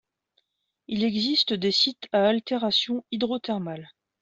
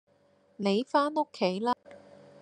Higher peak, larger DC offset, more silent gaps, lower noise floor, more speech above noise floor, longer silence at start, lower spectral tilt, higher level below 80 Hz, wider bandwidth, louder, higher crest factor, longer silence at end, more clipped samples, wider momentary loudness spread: about the same, -10 dBFS vs -12 dBFS; neither; neither; first, -73 dBFS vs -65 dBFS; first, 48 dB vs 37 dB; first, 0.9 s vs 0.6 s; about the same, -5 dB/octave vs -6 dB/octave; first, -68 dBFS vs -82 dBFS; second, 8 kHz vs 9.8 kHz; first, -24 LUFS vs -29 LUFS; about the same, 18 dB vs 20 dB; about the same, 0.35 s vs 0.45 s; neither; first, 9 LU vs 6 LU